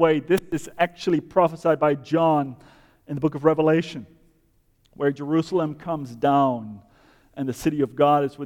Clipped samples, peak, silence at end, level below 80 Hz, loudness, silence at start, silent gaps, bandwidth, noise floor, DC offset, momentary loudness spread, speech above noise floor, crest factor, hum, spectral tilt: under 0.1%; -6 dBFS; 0 s; -58 dBFS; -23 LUFS; 0 s; none; 19 kHz; -63 dBFS; under 0.1%; 12 LU; 41 dB; 18 dB; none; -7 dB/octave